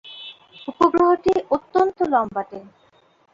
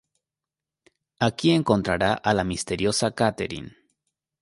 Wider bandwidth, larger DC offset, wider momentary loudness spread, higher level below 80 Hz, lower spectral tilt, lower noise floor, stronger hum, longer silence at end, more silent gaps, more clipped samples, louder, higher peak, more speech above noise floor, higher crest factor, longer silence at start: second, 7.4 kHz vs 11.5 kHz; neither; first, 20 LU vs 11 LU; second, -56 dBFS vs -50 dBFS; about the same, -6 dB/octave vs -5 dB/octave; second, -58 dBFS vs -89 dBFS; neither; about the same, 0.75 s vs 0.75 s; neither; neither; first, -20 LUFS vs -23 LUFS; about the same, -4 dBFS vs -4 dBFS; second, 38 dB vs 66 dB; about the same, 18 dB vs 22 dB; second, 0.05 s vs 1.2 s